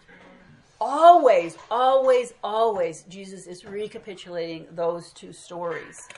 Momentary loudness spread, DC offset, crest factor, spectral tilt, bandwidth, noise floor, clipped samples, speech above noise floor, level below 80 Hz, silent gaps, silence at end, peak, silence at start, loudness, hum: 24 LU; under 0.1%; 20 dB; -4.5 dB/octave; 11.5 kHz; -52 dBFS; under 0.1%; 27 dB; -68 dBFS; none; 0.15 s; -2 dBFS; 0.8 s; -21 LUFS; none